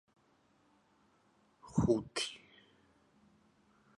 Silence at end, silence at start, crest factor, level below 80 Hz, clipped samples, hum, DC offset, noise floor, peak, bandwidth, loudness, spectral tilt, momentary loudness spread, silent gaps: 1.6 s; 1.65 s; 24 dB; -60 dBFS; under 0.1%; none; under 0.1%; -71 dBFS; -18 dBFS; 11.5 kHz; -35 LUFS; -5.5 dB/octave; 10 LU; none